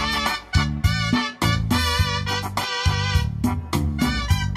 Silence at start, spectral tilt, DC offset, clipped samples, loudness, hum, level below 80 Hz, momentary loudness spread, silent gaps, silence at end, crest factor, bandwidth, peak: 0 s; -4.5 dB/octave; under 0.1%; under 0.1%; -22 LUFS; none; -30 dBFS; 4 LU; none; 0 s; 16 dB; 16 kHz; -6 dBFS